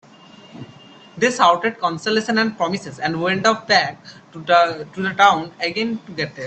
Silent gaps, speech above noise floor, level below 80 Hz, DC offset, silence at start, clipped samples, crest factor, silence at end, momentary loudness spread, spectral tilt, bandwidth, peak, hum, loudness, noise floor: none; 26 dB; -62 dBFS; under 0.1%; 0.55 s; under 0.1%; 20 dB; 0 s; 12 LU; -4 dB/octave; 9 kHz; 0 dBFS; none; -18 LUFS; -45 dBFS